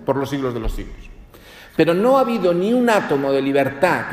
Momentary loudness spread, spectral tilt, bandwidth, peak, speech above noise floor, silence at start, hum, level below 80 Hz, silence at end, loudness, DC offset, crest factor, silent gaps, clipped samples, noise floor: 12 LU; -6 dB/octave; 15.5 kHz; -2 dBFS; 25 dB; 0 s; none; -36 dBFS; 0 s; -18 LUFS; under 0.1%; 16 dB; none; under 0.1%; -43 dBFS